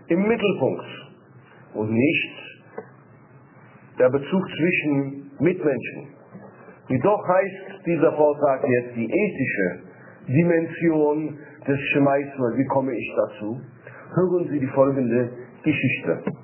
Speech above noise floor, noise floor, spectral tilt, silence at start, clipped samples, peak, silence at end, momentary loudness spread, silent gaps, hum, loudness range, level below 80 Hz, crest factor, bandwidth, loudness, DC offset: 28 dB; -49 dBFS; -11 dB/octave; 0.1 s; under 0.1%; -4 dBFS; 0 s; 16 LU; none; none; 3 LU; -62 dBFS; 18 dB; 3.2 kHz; -22 LUFS; under 0.1%